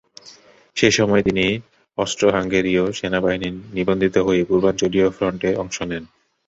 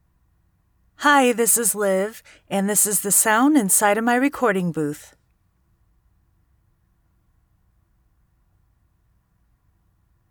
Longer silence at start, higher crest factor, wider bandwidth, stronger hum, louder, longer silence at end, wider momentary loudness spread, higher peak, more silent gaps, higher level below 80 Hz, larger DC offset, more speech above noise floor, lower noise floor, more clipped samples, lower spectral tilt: second, 0.25 s vs 1 s; about the same, 18 dB vs 18 dB; second, 8 kHz vs over 20 kHz; neither; about the same, -19 LUFS vs -18 LUFS; second, 0.4 s vs 5.3 s; about the same, 10 LU vs 11 LU; about the same, -2 dBFS vs -4 dBFS; neither; first, -46 dBFS vs -64 dBFS; neither; second, 28 dB vs 45 dB; second, -47 dBFS vs -64 dBFS; neither; first, -4.5 dB/octave vs -3 dB/octave